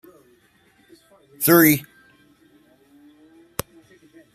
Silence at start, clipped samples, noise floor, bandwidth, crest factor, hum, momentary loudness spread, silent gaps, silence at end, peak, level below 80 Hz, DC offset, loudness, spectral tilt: 1.4 s; under 0.1%; -59 dBFS; 15.5 kHz; 24 dB; none; 19 LU; none; 2.5 s; 0 dBFS; -60 dBFS; under 0.1%; -18 LUFS; -4.5 dB/octave